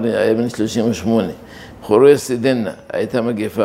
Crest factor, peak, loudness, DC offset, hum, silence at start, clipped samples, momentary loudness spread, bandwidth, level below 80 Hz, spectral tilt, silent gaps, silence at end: 16 dB; 0 dBFS; -17 LUFS; under 0.1%; none; 0 s; under 0.1%; 14 LU; 15.5 kHz; -52 dBFS; -6 dB/octave; none; 0 s